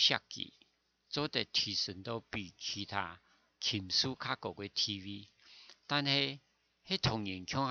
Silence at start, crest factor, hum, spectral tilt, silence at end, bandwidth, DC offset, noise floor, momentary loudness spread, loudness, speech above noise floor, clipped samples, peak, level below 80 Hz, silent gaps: 0 s; 24 dB; none; -3.5 dB/octave; 0 s; 7.4 kHz; under 0.1%; -72 dBFS; 13 LU; -35 LUFS; 35 dB; under 0.1%; -12 dBFS; -66 dBFS; none